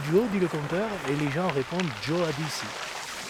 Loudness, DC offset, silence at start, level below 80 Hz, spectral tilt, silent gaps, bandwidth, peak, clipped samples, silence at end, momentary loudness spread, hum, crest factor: -28 LUFS; under 0.1%; 0 s; -58 dBFS; -5 dB/octave; none; 17.5 kHz; -12 dBFS; under 0.1%; 0 s; 7 LU; none; 16 dB